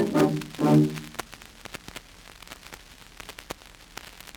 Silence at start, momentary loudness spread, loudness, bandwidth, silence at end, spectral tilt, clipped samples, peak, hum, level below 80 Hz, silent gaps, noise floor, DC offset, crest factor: 0 s; 23 LU; -24 LUFS; 19.5 kHz; 0.25 s; -6.5 dB/octave; under 0.1%; -8 dBFS; none; -54 dBFS; none; -48 dBFS; under 0.1%; 20 dB